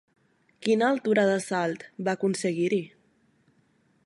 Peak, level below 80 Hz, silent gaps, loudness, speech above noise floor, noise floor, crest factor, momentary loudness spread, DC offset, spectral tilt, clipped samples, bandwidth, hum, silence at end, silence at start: -10 dBFS; -76 dBFS; none; -26 LUFS; 41 dB; -66 dBFS; 18 dB; 9 LU; under 0.1%; -5.5 dB/octave; under 0.1%; 11.5 kHz; none; 1.2 s; 0.6 s